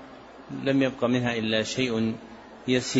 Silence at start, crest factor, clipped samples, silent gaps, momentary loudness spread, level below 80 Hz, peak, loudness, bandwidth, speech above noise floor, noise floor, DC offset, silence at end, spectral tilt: 0 s; 16 dB; under 0.1%; none; 18 LU; -60 dBFS; -10 dBFS; -26 LUFS; 8 kHz; 20 dB; -46 dBFS; under 0.1%; 0 s; -5 dB/octave